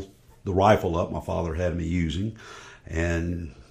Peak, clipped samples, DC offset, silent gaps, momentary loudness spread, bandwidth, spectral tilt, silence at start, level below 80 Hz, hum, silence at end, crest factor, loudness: -4 dBFS; under 0.1%; under 0.1%; none; 21 LU; 15.5 kHz; -7 dB/octave; 0 s; -40 dBFS; none; 0.1 s; 22 dB; -26 LUFS